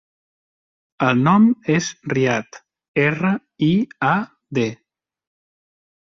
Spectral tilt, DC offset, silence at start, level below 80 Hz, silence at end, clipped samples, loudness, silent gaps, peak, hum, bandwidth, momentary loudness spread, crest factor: -6 dB/octave; under 0.1%; 1 s; -58 dBFS; 1.35 s; under 0.1%; -19 LUFS; 2.88-2.94 s; -4 dBFS; none; 7.6 kHz; 9 LU; 18 dB